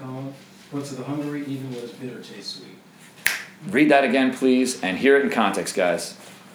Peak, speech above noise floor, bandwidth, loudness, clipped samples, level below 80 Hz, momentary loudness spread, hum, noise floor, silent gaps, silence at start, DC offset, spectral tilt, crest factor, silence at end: -2 dBFS; 25 dB; over 20 kHz; -21 LUFS; under 0.1%; -72 dBFS; 18 LU; none; -47 dBFS; none; 0 s; under 0.1%; -4.5 dB/octave; 22 dB; 0 s